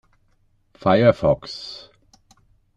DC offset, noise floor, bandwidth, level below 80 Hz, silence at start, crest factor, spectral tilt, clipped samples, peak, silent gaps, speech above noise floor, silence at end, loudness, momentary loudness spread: under 0.1%; -62 dBFS; 8 kHz; -50 dBFS; 0.85 s; 20 dB; -7.5 dB/octave; under 0.1%; -2 dBFS; none; 43 dB; 1 s; -19 LUFS; 19 LU